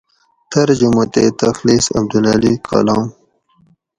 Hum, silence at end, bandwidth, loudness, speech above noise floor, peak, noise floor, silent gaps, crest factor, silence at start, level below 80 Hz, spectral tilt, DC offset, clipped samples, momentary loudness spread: none; 0.9 s; 11 kHz; -14 LUFS; 42 dB; 0 dBFS; -55 dBFS; none; 14 dB; 0.5 s; -44 dBFS; -5 dB/octave; under 0.1%; under 0.1%; 4 LU